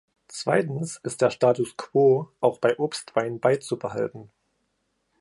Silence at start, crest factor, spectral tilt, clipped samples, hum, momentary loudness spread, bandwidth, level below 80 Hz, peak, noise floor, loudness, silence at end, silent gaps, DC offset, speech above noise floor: 0.3 s; 20 dB; -5.5 dB/octave; under 0.1%; none; 10 LU; 11.5 kHz; -70 dBFS; -6 dBFS; -74 dBFS; -24 LUFS; 0.95 s; none; under 0.1%; 50 dB